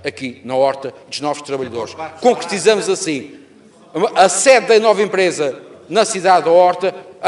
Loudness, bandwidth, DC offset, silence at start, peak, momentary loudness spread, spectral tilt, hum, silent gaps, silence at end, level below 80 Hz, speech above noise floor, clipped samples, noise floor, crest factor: -15 LUFS; 11.5 kHz; under 0.1%; 0.05 s; 0 dBFS; 15 LU; -3 dB/octave; none; none; 0 s; -64 dBFS; 30 dB; under 0.1%; -45 dBFS; 16 dB